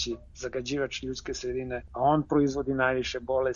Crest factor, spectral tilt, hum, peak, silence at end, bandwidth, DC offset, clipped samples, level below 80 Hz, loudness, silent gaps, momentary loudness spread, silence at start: 18 dB; -5 dB/octave; none; -12 dBFS; 0 s; 7.4 kHz; under 0.1%; under 0.1%; -48 dBFS; -29 LUFS; none; 10 LU; 0 s